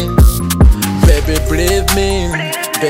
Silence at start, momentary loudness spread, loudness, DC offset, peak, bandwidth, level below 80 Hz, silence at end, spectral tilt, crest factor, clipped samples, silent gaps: 0 s; 6 LU; -13 LUFS; under 0.1%; 0 dBFS; 16.5 kHz; -14 dBFS; 0 s; -5 dB/octave; 12 dB; under 0.1%; none